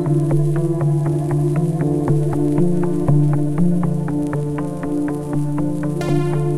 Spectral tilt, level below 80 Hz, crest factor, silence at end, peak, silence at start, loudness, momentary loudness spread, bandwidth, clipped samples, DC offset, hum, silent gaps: -9 dB/octave; -40 dBFS; 12 dB; 0 s; -6 dBFS; 0 s; -19 LUFS; 5 LU; 12 kHz; under 0.1%; under 0.1%; none; none